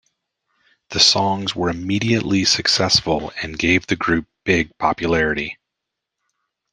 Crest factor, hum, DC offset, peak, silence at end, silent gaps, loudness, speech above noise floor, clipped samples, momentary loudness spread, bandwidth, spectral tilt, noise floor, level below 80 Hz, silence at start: 20 dB; none; under 0.1%; 0 dBFS; 1.2 s; none; -18 LUFS; 63 dB; under 0.1%; 9 LU; 12 kHz; -3.5 dB/octave; -82 dBFS; -46 dBFS; 0.9 s